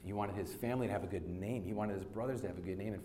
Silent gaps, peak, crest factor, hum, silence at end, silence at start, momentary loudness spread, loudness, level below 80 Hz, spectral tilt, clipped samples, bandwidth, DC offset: none; -24 dBFS; 16 dB; none; 0 s; 0 s; 4 LU; -40 LUFS; -60 dBFS; -7.5 dB/octave; under 0.1%; 16.5 kHz; under 0.1%